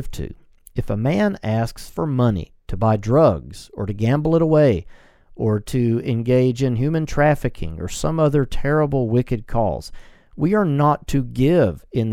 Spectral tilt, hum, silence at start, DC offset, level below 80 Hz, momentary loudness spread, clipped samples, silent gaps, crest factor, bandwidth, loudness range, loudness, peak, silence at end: -7.5 dB/octave; none; 0 s; under 0.1%; -36 dBFS; 13 LU; under 0.1%; none; 18 dB; 14.5 kHz; 2 LU; -20 LUFS; -2 dBFS; 0 s